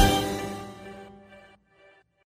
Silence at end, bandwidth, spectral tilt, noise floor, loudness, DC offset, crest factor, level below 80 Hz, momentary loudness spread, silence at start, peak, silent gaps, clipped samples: 0.9 s; 16 kHz; -4 dB/octave; -59 dBFS; -29 LUFS; under 0.1%; 22 dB; -38 dBFS; 26 LU; 0 s; -6 dBFS; none; under 0.1%